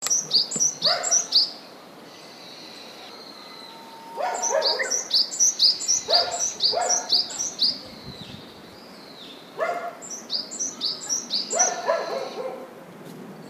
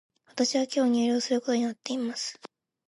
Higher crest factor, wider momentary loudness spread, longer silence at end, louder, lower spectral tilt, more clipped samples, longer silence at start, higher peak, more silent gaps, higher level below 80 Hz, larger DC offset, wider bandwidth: about the same, 20 dB vs 16 dB; first, 23 LU vs 11 LU; second, 0 s vs 0.4 s; first, -21 LUFS vs -27 LUFS; second, 0.5 dB/octave vs -3 dB/octave; neither; second, 0 s vs 0.35 s; first, -6 dBFS vs -12 dBFS; neither; first, -70 dBFS vs -80 dBFS; neither; first, 15.5 kHz vs 11.5 kHz